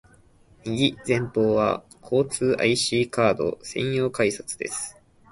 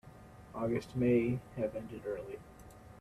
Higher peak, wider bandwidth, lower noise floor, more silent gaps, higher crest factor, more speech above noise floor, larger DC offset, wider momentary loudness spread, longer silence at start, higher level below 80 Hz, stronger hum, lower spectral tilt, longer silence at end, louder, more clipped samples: first, -6 dBFS vs -18 dBFS; second, 11.5 kHz vs 13.5 kHz; about the same, -55 dBFS vs -54 dBFS; neither; about the same, 18 dB vs 18 dB; first, 32 dB vs 19 dB; neither; second, 10 LU vs 25 LU; first, 0.65 s vs 0.05 s; about the same, -56 dBFS vs -60 dBFS; neither; second, -4.5 dB/octave vs -8.5 dB/octave; first, 0.4 s vs 0 s; first, -24 LUFS vs -35 LUFS; neither